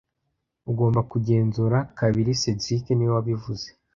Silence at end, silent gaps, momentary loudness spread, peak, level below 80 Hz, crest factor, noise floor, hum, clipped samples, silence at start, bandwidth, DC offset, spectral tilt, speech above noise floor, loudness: 0.25 s; none; 9 LU; -8 dBFS; -52 dBFS; 16 dB; -78 dBFS; none; under 0.1%; 0.65 s; 7.4 kHz; under 0.1%; -6.5 dB/octave; 55 dB; -24 LUFS